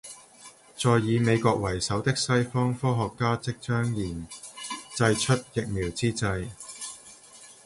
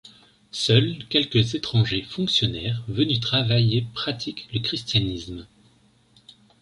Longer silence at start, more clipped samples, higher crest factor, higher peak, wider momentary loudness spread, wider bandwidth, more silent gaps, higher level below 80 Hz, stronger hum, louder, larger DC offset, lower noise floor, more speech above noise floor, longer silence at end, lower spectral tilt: about the same, 0.05 s vs 0.05 s; neither; about the same, 20 dB vs 20 dB; second, -8 dBFS vs -4 dBFS; first, 17 LU vs 10 LU; about the same, 11.5 kHz vs 11 kHz; neither; about the same, -50 dBFS vs -50 dBFS; neither; second, -27 LUFS vs -23 LUFS; neither; second, -51 dBFS vs -59 dBFS; second, 25 dB vs 36 dB; second, 0.15 s vs 1.15 s; about the same, -5 dB/octave vs -5.5 dB/octave